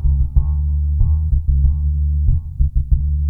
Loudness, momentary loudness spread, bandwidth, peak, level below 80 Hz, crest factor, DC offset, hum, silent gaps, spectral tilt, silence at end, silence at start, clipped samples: -19 LUFS; 3 LU; 1.2 kHz; -2 dBFS; -16 dBFS; 14 dB; under 0.1%; none; none; -13 dB/octave; 0 s; 0 s; under 0.1%